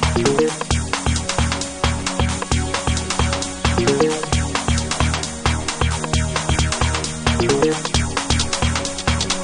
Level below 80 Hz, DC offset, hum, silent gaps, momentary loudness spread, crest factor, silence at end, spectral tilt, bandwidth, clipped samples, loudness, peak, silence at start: -26 dBFS; under 0.1%; none; none; 4 LU; 18 dB; 0 s; -4 dB/octave; 11 kHz; under 0.1%; -20 LUFS; -2 dBFS; 0 s